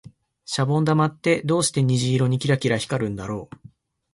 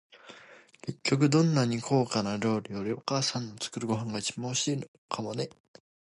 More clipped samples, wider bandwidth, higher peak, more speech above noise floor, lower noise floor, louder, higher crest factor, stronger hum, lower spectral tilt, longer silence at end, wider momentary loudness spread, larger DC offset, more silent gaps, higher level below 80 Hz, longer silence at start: neither; about the same, 11.5 kHz vs 11.5 kHz; first, -6 dBFS vs -12 dBFS; first, 29 dB vs 25 dB; second, -50 dBFS vs -54 dBFS; first, -22 LUFS vs -30 LUFS; about the same, 16 dB vs 18 dB; neither; about the same, -5.5 dB/octave vs -5 dB/octave; first, 0.7 s vs 0.5 s; second, 10 LU vs 13 LU; neither; second, none vs 4.88-5.09 s; first, -54 dBFS vs -68 dBFS; first, 0.5 s vs 0.15 s